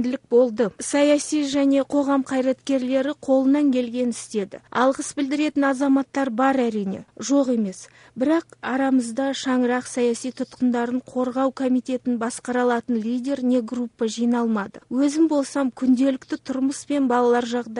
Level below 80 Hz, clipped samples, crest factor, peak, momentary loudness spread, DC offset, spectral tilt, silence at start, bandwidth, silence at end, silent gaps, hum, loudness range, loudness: -66 dBFS; under 0.1%; 16 dB; -6 dBFS; 8 LU; under 0.1%; -4.5 dB/octave; 0 s; 10.5 kHz; 0 s; none; none; 3 LU; -22 LUFS